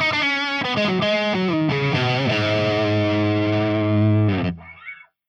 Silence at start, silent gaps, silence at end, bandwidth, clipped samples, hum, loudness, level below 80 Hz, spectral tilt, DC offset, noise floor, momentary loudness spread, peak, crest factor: 0 s; none; 0.35 s; 7.4 kHz; under 0.1%; none; -20 LUFS; -58 dBFS; -6.5 dB/octave; under 0.1%; -41 dBFS; 7 LU; -8 dBFS; 12 dB